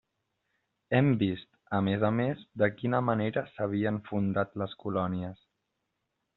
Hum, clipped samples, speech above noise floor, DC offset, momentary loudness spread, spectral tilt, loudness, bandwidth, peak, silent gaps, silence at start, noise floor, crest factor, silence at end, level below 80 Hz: none; under 0.1%; 53 dB; under 0.1%; 7 LU; -6.5 dB/octave; -30 LUFS; 4.2 kHz; -10 dBFS; none; 0.9 s; -82 dBFS; 22 dB; 1 s; -66 dBFS